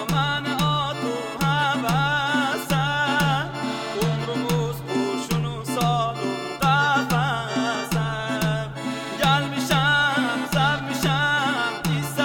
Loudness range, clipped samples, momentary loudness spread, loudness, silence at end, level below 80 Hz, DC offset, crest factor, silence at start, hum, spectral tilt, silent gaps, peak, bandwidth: 2 LU; under 0.1%; 7 LU; -23 LUFS; 0 s; -46 dBFS; under 0.1%; 16 dB; 0 s; none; -4.5 dB/octave; none; -6 dBFS; 17.5 kHz